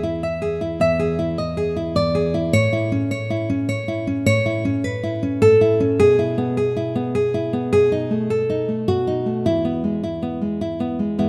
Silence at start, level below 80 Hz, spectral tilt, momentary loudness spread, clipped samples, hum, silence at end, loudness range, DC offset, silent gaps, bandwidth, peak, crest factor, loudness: 0 s; -44 dBFS; -7.5 dB/octave; 8 LU; under 0.1%; none; 0 s; 3 LU; under 0.1%; none; 12 kHz; -4 dBFS; 16 dB; -20 LUFS